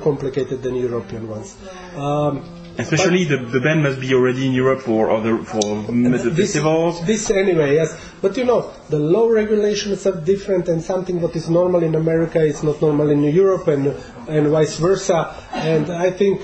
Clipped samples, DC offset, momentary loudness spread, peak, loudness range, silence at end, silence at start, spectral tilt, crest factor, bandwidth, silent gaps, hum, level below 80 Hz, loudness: under 0.1%; under 0.1%; 8 LU; -4 dBFS; 2 LU; 0 s; 0 s; -6 dB/octave; 14 dB; 8.6 kHz; none; none; -46 dBFS; -18 LUFS